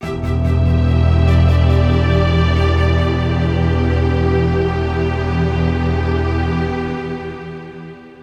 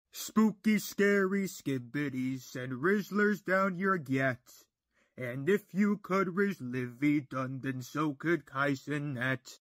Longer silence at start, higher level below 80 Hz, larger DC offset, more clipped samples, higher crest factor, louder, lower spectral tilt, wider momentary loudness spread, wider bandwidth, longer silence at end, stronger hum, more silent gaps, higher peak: second, 0 s vs 0.15 s; first, -22 dBFS vs -76 dBFS; neither; neither; second, 12 dB vs 18 dB; first, -16 LUFS vs -32 LUFS; first, -8 dB/octave vs -6 dB/octave; first, 12 LU vs 9 LU; second, 6.8 kHz vs 16 kHz; about the same, 0 s vs 0.1 s; neither; neither; first, -2 dBFS vs -14 dBFS